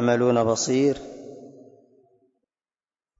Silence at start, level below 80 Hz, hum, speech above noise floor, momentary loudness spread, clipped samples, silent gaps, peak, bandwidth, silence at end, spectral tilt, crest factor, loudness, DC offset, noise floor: 0 s; -60 dBFS; none; over 69 dB; 22 LU; under 0.1%; none; -8 dBFS; 7.8 kHz; 1.7 s; -5 dB/octave; 16 dB; -22 LUFS; under 0.1%; under -90 dBFS